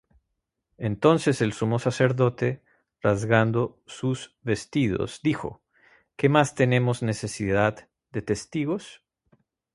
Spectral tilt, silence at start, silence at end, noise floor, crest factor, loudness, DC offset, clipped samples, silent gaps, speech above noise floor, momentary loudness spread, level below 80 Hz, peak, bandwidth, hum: -6.5 dB/octave; 0.8 s; 0.8 s; -80 dBFS; 22 dB; -25 LUFS; under 0.1%; under 0.1%; none; 56 dB; 11 LU; -54 dBFS; -4 dBFS; 11.5 kHz; none